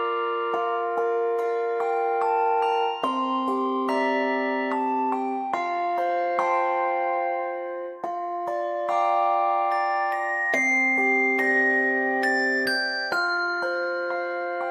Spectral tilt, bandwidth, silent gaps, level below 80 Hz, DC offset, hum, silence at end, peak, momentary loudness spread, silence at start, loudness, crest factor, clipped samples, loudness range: -3 dB/octave; 14 kHz; none; -80 dBFS; under 0.1%; none; 0 s; -10 dBFS; 8 LU; 0 s; -24 LUFS; 14 dB; under 0.1%; 4 LU